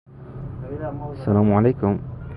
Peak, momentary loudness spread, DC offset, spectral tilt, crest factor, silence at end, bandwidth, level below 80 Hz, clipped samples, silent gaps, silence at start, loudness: -4 dBFS; 17 LU; under 0.1%; -12 dB/octave; 18 dB; 0 s; 4.9 kHz; -42 dBFS; under 0.1%; none; 0.1 s; -21 LUFS